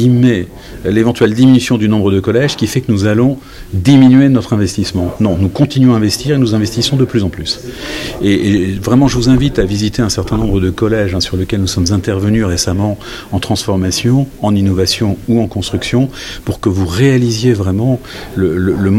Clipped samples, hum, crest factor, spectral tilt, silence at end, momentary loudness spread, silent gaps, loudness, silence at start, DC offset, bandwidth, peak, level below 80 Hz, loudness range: under 0.1%; none; 12 dB; -6 dB/octave; 0 s; 9 LU; none; -13 LUFS; 0 s; under 0.1%; 16 kHz; 0 dBFS; -32 dBFS; 3 LU